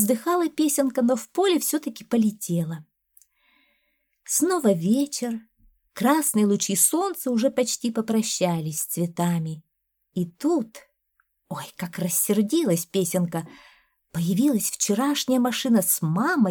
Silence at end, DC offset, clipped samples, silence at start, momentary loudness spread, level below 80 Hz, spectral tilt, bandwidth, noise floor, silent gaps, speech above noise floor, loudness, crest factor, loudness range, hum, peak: 0 s; under 0.1%; under 0.1%; 0 s; 13 LU; -70 dBFS; -4.5 dB/octave; over 20 kHz; -72 dBFS; none; 48 dB; -23 LUFS; 20 dB; 5 LU; none; -4 dBFS